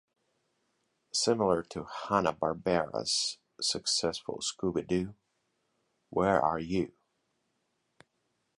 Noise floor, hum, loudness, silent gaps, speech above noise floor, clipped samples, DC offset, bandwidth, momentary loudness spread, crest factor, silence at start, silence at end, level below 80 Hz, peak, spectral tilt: -79 dBFS; none; -31 LUFS; none; 48 dB; under 0.1%; under 0.1%; 11.5 kHz; 8 LU; 22 dB; 1.15 s; 1.7 s; -60 dBFS; -10 dBFS; -3.5 dB/octave